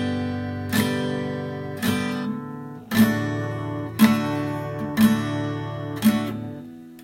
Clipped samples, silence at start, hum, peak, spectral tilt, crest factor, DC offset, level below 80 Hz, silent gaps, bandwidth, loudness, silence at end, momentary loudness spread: under 0.1%; 0 s; none; -4 dBFS; -6 dB/octave; 20 dB; under 0.1%; -56 dBFS; none; 16.5 kHz; -24 LUFS; 0 s; 12 LU